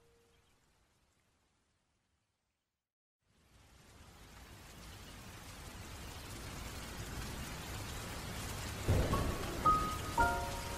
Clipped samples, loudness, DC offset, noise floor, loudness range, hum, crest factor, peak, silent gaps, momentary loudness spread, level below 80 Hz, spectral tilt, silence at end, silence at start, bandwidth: under 0.1%; -38 LUFS; under 0.1%; -88 dBFS; 22 LU; none; 22 dB; -18 dBFS; none; 21 LU; -48 dBFS; -4.5 dB/octave; 0 s; 3.55 s; 16 kHz